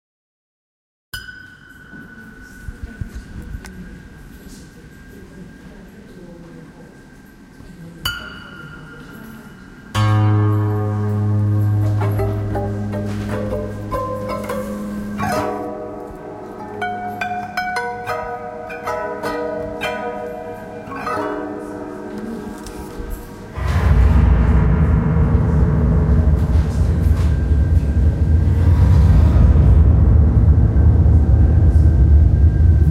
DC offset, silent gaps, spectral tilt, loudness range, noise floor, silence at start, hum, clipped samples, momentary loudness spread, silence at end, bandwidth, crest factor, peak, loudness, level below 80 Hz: under 0.1%; none; -8 dB/octave; 22 LU; -42 dBFS; 1.15 s; none; under 0.1%; 23 LU; 0 s; 12.5 kHz; 14 dB; -2 dBFS; -17 LUFS; -20 dBFS